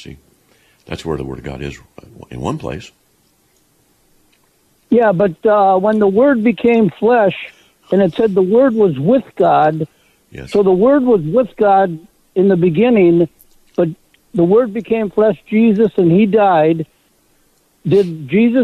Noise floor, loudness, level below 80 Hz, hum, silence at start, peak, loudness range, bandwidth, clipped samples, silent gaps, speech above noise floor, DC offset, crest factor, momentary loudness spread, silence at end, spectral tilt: -57 dBFS; -14 LUFS; -46 dBFS; none; 0 s; -4 dBFS; 14 LU; 10.5 kHz; under 0.1%; none; 44 dB; under 0.1%; 12 dB; 15 LU; 0 s; -8.5 dB/octave